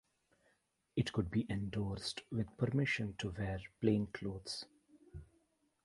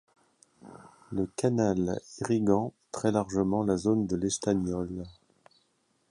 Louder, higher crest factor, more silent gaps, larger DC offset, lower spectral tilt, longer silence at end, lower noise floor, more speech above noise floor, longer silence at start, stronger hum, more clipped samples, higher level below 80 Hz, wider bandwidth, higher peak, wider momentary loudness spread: second, -39 LUFS vs -29 LUFS; about the same, 22 dB vs 18 dB; neither; neither; about the same, -6 dB/octave vs -6 dB/octave; second, 0.6 s vs 1 s; first, -78 dBFS vs -72 dBFS; second, 40 dB vs 44 dB; first, 0.95 s vs 0.65 s; neither; neither; about the same, -58 dBFS vs -54 dBFS; about the same, 11.5 kHz vs 11.5 kHz; second, -18 dBFS vs -12 dBFS; first, 16 LU vs 10 LU